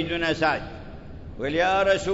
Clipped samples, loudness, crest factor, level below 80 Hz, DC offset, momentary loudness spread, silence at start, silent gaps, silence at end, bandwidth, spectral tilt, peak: under 0.1%; -24 LUFS; 16 dB; -44 dBFS; under 0.1%; 20 LU; 0 s; none; 0 s; 8 kHz; -5 dB/octave; -8 dBFS